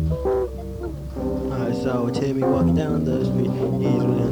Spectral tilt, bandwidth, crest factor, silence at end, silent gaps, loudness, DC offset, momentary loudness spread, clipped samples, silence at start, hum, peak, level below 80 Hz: -8.5 dB/octave; over 20 kHz; 12 dB; 0 s; none; -23 LUFS; under 0.1%; 10 LU; under 0.1%; 0 s; none; -10 dBFS; -36 dBFS